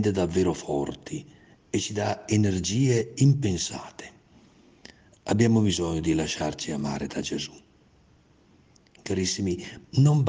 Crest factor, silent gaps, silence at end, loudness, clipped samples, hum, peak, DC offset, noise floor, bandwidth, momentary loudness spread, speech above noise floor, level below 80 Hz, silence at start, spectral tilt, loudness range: 18 dB; none; 0 s; -26 LUFS; under 0.1%; none; -8 dBFS; under 0.1%; -59 dBFS; 9.8 kHz; 16 LU; 34 dB; -54 dBFS; 0 s; -5.5 dB/octave; 6 LU